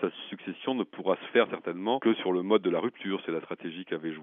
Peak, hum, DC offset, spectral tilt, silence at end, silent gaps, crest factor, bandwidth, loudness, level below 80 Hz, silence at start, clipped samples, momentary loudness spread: -10 dBFS; none; under 0.1%; -3.5 dB/octave; 0 s; none; 20 dB; 3.9 kHz; -30 LUFS; -88 dBFS; 0 s; under 0.1%; 10 LU